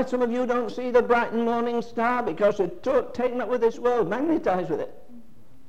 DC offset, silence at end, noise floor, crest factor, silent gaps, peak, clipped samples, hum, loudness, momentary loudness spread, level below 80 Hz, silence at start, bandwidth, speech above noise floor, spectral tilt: 1%; 0.45 s; -53 dBFS; 16 dB; none; -8 dBFS; under 0.1%; none; -24 LUFS; 5 LU; -54 dBFS; 0 s; 8.2 kHz; 29 dB; -6.5 dB/octave